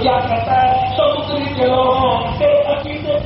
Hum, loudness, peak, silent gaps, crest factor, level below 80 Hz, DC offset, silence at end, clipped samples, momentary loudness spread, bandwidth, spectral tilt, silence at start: none; -15 LUFS; -4 dBFS; none; 12 dB; -36 dBFS; under 0.1%; 0 s; under 0.1%; 6 LU; 5.8 kHz; -4 dB/octave; 0 s